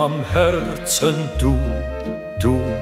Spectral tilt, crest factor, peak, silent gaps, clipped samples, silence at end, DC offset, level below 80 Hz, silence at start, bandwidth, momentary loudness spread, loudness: -5 dB/octave; 16 dB; -4 dBFS; none; under 0.1%; 0 s; under 0.1%; -28 dBFS; 0 s; 16 kHz; 9 LU; -20 LUFS